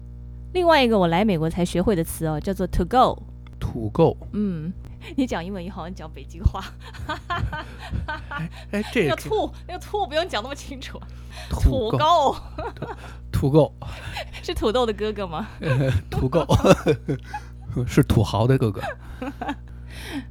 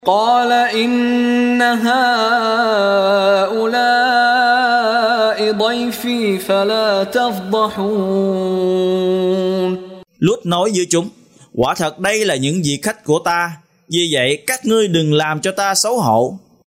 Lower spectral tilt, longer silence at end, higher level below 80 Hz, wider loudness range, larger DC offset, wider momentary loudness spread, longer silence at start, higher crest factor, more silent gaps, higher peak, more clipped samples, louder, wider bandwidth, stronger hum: first, -6.5 dB/octave vs -4 dB/octave; second, 0 s vs 0.3 s; first, -34 dBFS vs -56 dBFS; first, 8 LU vs 4 LU; neither; first, 17 LU vs 6 LU; about the same, 0 s vs 0.05 s; first, 22 dB vs 16 dB; neither; about the same, 0 dBFS vs 0 dBFS; neither; second, -23 LUFS vs -15 LUFS; first, 18 kHz vs 16 kHz; first, 60 Hz at -40 dBFS vs none